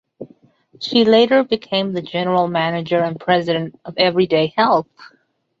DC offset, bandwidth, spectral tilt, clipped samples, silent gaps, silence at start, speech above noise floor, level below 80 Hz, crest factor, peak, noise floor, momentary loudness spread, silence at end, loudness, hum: under 0.1%; 7.6 kHz; -6.5 dB/octave; under 0.1%; none; 0.2 s; 34 dB; -60 dBFS; 16 dB; -2 dBFS; -51 dBFS; 9 LU; 0.55 s; -17 LUFS; none